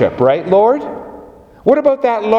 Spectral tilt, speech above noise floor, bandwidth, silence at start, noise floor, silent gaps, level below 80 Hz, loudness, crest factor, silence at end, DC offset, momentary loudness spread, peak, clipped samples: -8 dB/octave; 26 dB; 6.8 kHz; 0 s; -38 dBFS; none; -50 dBFS; -13 LUFS; 14 dB; 0 s; under 0.1%; 16 LU; 0 dBFS; under 0.1%